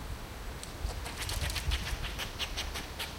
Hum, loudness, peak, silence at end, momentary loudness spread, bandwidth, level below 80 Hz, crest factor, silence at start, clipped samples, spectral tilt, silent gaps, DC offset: none; -37 LUFS; -18 dBFS; 0 s; 9 LU; 17 kHz; -40 dBFS; 18 dB; 0 s; under 0.1%; -3 dB/octave; none; under 0.1%